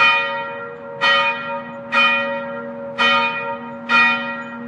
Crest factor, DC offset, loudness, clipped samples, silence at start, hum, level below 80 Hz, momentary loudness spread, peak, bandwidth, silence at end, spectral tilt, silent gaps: 16 dB; under 0.1%; -17 LUFS; under 0.1%; 0 s; none; -68 dBFS; 15 LU; -4 dBFS; 10.5 kHz; 0 s; -3 dB/octave; none